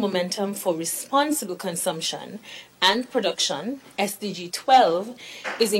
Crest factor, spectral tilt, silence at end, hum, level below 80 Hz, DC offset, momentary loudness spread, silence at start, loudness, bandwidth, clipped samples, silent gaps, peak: 18 dB; -2.5 dB/octave; 0 s; none; -70 dBFS; under 0.1%; 15 LU; 0 s; -24 LUFS; 16.5 kHz; under 0.1%; none; -6 dBFS